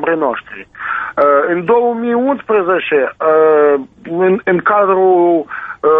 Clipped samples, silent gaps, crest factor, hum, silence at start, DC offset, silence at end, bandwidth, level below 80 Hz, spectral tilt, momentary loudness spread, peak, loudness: under 0.1%; none; 12 dB; none; 0 s; under 0.1%; 0 s; 3.9 kHz; -56 dBFS; -9 dB/octave; 10 LU; 0 dBFS; -13 LUFS